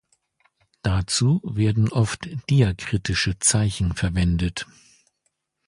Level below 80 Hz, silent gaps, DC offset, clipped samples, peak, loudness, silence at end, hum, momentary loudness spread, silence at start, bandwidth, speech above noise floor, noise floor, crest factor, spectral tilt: -36 dBFS; none; under 0.1%; under 0.1%; -6 dBFS; -22 LUFS; 1.05 s; none; 9 LU; 0.85 s; 11.5 kHz; 52 dB; -74 dBFS; 18 dB; -4.5 dB/octave